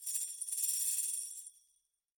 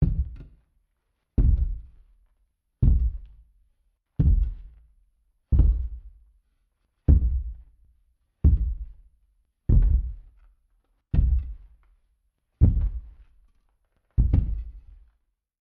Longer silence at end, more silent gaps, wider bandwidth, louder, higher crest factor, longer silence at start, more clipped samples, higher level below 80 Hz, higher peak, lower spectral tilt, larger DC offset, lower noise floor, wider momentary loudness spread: second, 0.7 s vs 0.9 s; neither; first, 17 kHz vs 1.9 kHz; second, -34 LUFS vs -26 LUFS; about the same, 20 dB vs 20 dB; about the same, 0 s vs 0 s; neither; second, -84 dBFS vs -26 dBFS; second, -20 dBFS vs -6 dBFS; second, 6 dB/octave vs -12.5 dB/octave; neither; about the same, -78 dBFS vs -75 dBFS; second, 15 LU vs 19 LU